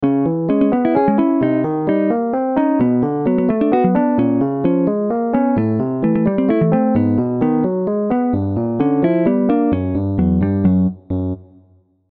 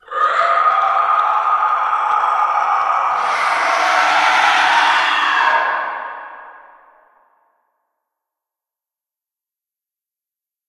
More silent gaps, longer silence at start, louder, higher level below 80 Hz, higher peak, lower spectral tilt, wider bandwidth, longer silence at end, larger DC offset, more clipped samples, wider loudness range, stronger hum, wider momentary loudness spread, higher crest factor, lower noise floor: neither; about the same, 0 s vs 0.1 s; second, -17 LUFS vs -14 LUFS; first, -42 dBFS vs -66 dBFS; second, -4 dBFS vs 0 dBFS; first, -12.5 dB/octave vs 0 dB/octave; second, 4.3 kHz vs 13 kHz; second, 0.65 s vs 4.1 s; neither; neither; second, 1 LU vs 8 LU; neither; second, 4 LU vs 7 LU; second, 12 dB vs 18 dB; second, -53 dBFS vs -89 dBFS